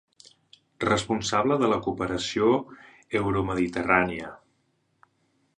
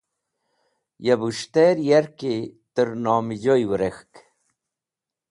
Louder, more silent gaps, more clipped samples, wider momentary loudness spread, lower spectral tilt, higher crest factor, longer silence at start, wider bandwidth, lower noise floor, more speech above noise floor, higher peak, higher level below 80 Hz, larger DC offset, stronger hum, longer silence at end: second, -25 LUFS vs -22 LUFS; neither; neither; about the same, 8 LU vs 10 LU; about the same, -5 dB/octave vs -6 dB/octave; about the same, 22 dB vs 18 dB; second, 0.8 s vs 1 s; about the same, 11 kHz vs 11.5 kHz; second, -71 dBFS vs -88 dBFS; second, 46 dB vs 68 dB; about the same, -4 dBFS vs -6 dBFS; first, -52 dBFS vs -60 dBFS; neither; neither; about the same, 1.2 s vs 1.3 s